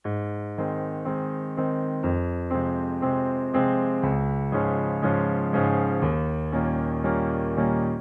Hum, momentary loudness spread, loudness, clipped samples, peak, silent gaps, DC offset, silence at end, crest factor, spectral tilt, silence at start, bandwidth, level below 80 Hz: none; 6 LU; -26 LUFS; under 0.1%; -10 dBFS; none; under 0.1%; 0 s; 16 dB; -11 dB/octave; 0.05 s; 3.8 kHz; -44 dBFS